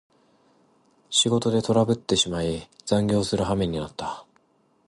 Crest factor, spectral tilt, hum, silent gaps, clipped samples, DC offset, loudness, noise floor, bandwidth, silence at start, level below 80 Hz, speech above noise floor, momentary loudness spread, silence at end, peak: 18 dB; -4.5 dB/octave; none; none; under 0.1%; under 0.1%; -24 LUFS; -65 dBFS; 11.5 kHz; 1.1 s; -48 dBFS; 41 dB; 12 LU; 0.65 s; -8 dBFS